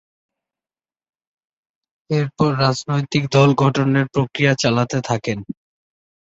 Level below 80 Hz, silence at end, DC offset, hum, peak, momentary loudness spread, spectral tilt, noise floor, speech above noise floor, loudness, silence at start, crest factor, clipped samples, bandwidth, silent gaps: -54 dBFS; 0.85 s; under 0.1%; none; -2 dBFS; 9 LU; -6 dB/octave; under -90 dBFS; over 72 dB; -18 LUFS; 2.1 s; 18 dB; under 0.1%; 8 kHz; none